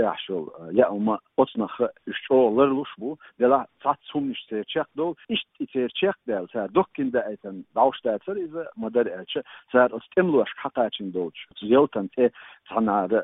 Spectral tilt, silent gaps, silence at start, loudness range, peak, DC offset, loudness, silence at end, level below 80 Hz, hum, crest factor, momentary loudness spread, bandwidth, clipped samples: -10 dB/octave; none; 0 s; 3 LU; -4 dBFS; under 0.1%; -25 LUFS; 0 s; -66 dBFS; none; 20 dB; 11 LU; 4 kHz; under 0.1%